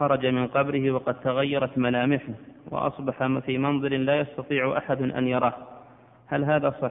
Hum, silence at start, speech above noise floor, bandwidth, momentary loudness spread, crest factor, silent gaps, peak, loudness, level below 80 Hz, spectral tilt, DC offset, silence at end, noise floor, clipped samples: none; 0 s; 27 dB; 3.9 kHz; 6 LU; 18 dB; none; -8 dBFS; -25 LUFS; -62 dBFS; -11 dB/octave; under 0.1%; 0 s; -52 dBFS; under 0.1%